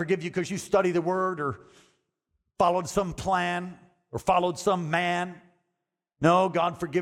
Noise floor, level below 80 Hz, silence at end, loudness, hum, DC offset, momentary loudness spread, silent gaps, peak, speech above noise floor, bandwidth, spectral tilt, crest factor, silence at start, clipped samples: -83 dBFS; -56 dBFS; 0 s; -26 LUFS; none; under 0.1%; 10 LU; none; -10 dBFS; 57 dB; 15 kHz; -5.5 dB/octave; 18 dB; 0 s; under 0.1%